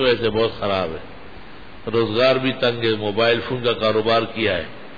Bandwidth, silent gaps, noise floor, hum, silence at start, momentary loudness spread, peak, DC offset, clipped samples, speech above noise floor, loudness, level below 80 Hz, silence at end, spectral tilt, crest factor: 5 kHz; none; -41 dBFS; none; 0 s; 17 LU; -6 dBFS; 1%; under 0.1%; 21 dB; -20 LUFS; -48 dBFS; 0 s; -7 dB/octave; 16 dB